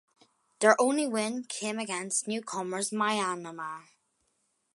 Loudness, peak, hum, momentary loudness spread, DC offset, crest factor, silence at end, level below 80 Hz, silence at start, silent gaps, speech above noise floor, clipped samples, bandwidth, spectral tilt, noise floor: -29 LUFS; -6 dBFS; none; 14 LU; under 0.1%; 24 dB; 0.95 s; -86 dBFS; 0.6 s; none; 46 dB; under 0.1%; 12 kHz; -3 dB/octave; -76 dBFS